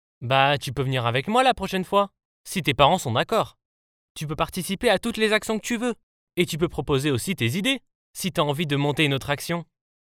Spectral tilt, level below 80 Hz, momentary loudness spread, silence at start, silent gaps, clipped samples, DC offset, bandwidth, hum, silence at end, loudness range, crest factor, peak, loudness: -4.5 dB/octave; -50 dBFS; 11 LU; 0.2 s; 2.25-2.44 s, 3.65-4.15 s, 6.03-6.27 s, 7.95-8.14 s; under 0.1%; under 0.1%; 17.5 kHz; none; 0.4 s; 3 LU; 22 dB; -2 dBFS; -24 LUFS